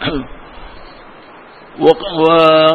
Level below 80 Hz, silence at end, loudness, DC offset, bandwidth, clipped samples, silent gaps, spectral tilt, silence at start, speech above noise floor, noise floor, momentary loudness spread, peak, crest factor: -40 dBFS; 0 s; -12 LUFS; 0.2%; 7 kHz; 0.2%; none; -7 dB/octave; 0 s; 27 dB; -38 dBFS; 16 LU; 0 dBFS; 14 dB